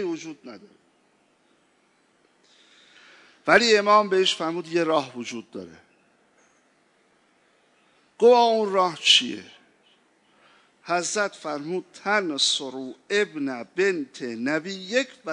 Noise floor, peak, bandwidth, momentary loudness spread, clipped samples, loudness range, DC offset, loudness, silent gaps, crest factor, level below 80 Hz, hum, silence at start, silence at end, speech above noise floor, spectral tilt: -64 dBFS; -2 dBFS; 11 kHz; 18 LU; under 0.1%; 8 LU; under 0.1%; -22 LUFS; none; 24 dB; -78 dBFS; none; 0 s; 0 s; 41 dB; -2.5 dB/octave